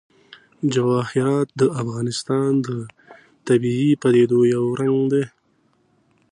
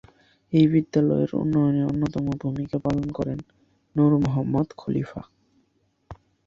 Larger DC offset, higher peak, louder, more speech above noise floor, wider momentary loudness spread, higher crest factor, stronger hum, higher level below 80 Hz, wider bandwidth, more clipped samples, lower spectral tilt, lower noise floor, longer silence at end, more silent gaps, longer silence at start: neither; about the same, -6 dBFS vs -8 dBFS; first, -20 LUFS vs -24 LUFS; about the same, 44 dB vs 45 dB; about the same, 10 LU vs 10 LU; about the same, 16 dB vs 18 dB; neither; second, -62 dBFS vs -50 dBFS; first, 10.5 kHz vs 7.2 kHz; neither; second, -7 dB/octave vs -9.5 dB/octave; second, -63 dBFS vs -68 dBFS; first, 1.05 s vs 0.3 s; neither; about the same, 0.6 s vs 0.5 s